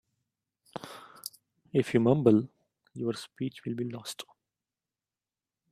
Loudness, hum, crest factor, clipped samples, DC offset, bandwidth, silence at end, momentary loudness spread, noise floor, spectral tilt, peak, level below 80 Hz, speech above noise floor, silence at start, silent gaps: -29 LUFS; none; 24 dB; under 0.1%; under 0.1%; 15.5 kHz; 1.5 s; 22 LU; under -90 dBFS; -7 dB/octave; -8 dBFS; -70 dBFS; over 62 dB; 0.75 s; none